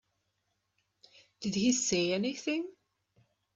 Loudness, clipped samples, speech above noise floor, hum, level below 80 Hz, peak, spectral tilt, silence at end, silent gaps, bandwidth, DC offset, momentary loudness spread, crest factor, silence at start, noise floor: -31 LUFS; under 0.1%; 50 dB; 50 Hz at -55 dBFS; -70 dBFS; -16 dBFS; -3.5 dB/octave; 0.85 s; none; 8.4 kHz; under 0.1%; 10 LU; 18 dB; 1.4 s; -80 dBFS